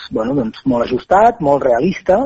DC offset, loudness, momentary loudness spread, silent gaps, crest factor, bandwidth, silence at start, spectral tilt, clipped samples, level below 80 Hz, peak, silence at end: under 0.1%; -15 LUFS; 7 LU; none; 12 dB; 7.8 kHz; 0 s; -7.5 dB/octave; under 0.1%; -42 dBFS; -2 dBFS; 0 s